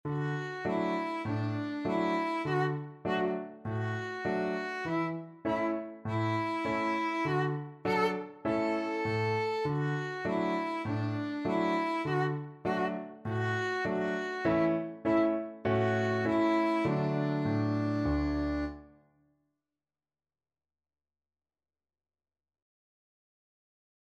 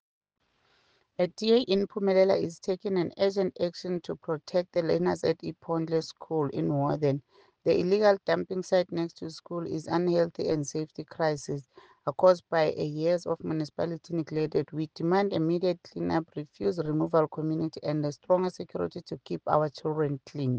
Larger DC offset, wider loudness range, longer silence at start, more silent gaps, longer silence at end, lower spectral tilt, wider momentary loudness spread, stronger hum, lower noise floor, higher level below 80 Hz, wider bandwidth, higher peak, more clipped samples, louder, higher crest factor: neither; about the same, 4 LU vs 2 LU; second, 0.05 s vs 1.2 s; neither; first, 5.3 s vs 0 s; about the same, -7.5 dB/octave vs -6.5 dB/octave; second, 6 LU vs 11 LU; neither; first, under -90 dBFS vs -68 dBFS; first, -54 dBFS vs -68 dBFS; first, 11.5 kHz vs 9.2 kHz; second, -18 dBFS vs -8 dBFS; neither; second, -32 LUFS vs -29 LUFS; about the same, 16 dB vs 20 dB